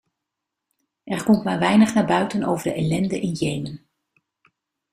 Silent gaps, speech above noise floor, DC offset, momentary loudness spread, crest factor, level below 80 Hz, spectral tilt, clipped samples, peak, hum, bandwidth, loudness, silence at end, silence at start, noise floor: none; 63 dB; under 0.1%; 13 LU; 18 dB; -56 dBFS; -6 dB/octave; under 0.1%; -4 dBFS; none; 15 kHz; -21 LUFS; 1.15 s; 1.05 s; -83 dBFS